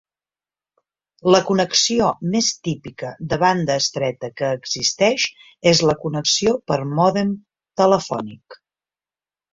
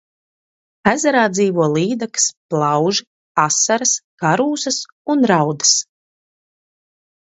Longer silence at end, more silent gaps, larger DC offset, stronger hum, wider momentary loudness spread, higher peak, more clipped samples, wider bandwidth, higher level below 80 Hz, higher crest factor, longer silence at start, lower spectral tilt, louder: second, 1 s vs 1.4 s; second, none vs 2.37-2.49 s, 3.07-3.35 s, 4.04-4.18 s, 4.92-5.05 s; neither; neither; first, 12 LU vs 6 LU; about the same, -2 dBFS vs 0 dBFS; neither; about the same, 7.8 kHz vs 8.2 kHz; first, -54 dBFS vs -62 dBFS; about the same, 20 dB vs 18 dB; first, 1.25 s vs 0.85 s; about the same, -4 dB/octave vs -3 dB/octave; second, -19 LUFS vs -16 LUFS